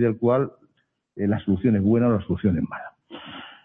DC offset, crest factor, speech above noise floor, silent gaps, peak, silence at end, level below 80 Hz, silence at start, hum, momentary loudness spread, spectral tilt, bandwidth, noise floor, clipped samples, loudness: under 0.1%; 14 dB; 48 dB; none; -10 dBFS; 0.15 s; -52 dBFS; 0 s; none; 19 LU; -11.5 dB/octave; 3.8 kHz; -70 dBFS; under 0.1%; -23 LUFS